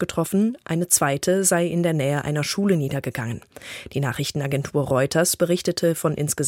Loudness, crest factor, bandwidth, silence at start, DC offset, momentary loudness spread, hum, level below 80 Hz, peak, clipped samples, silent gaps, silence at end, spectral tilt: -22 LUFS; 20 dB; 17 kHz; 0 s; under 0.1%; 10 LU; none; -54 dBFS; -2 dBFS; under 0.1%; none; 0 s; -4.5 dB/octave